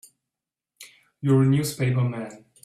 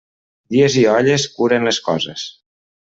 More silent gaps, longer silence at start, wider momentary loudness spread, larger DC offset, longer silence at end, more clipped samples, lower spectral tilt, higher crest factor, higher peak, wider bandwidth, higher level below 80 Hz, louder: neither; first, 0.8 s vs 0.5 s; first, 14 LU vs 11 LU; neither; second, 0.3 s vs 0.65 s; neither; first, -7 dB/octave vs -4.5 dB/octave; about the same, 16 dB vs 14 dB; second, -8 dBFS vs -2 dBFS; first, 14.5 kHz vs 8 kHz; about the same, -60 dBFS vs -58 dBFS; second, -23 LUFS vs -16 LUFS